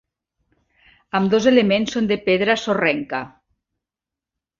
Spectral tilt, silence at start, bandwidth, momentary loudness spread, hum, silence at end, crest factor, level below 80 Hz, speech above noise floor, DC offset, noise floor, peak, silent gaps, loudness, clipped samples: -5.5 dB/octave; 1.15 s; 7.4 kHz; 12 LU; none; 1.3 s; 20 dB; -58 dBFS; 69 dB; under 0.1%; -88 dBFS; -2 dBFS; none; -19 LUFS; under 0.1%